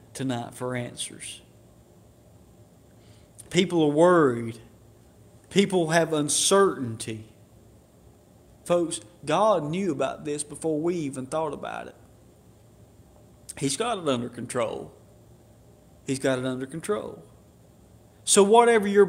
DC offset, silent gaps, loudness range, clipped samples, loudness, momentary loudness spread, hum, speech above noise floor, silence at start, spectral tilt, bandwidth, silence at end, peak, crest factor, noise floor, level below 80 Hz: under 0.1%; none; 9 LU; under 0.1%; -25 LUFS; 19 LU; none; 30 dB; 0.15 s; -4 dB/octave; 16 kHz; 0 s; -4 dBFS; 24 dB; -54 dBFS; -62 dBFS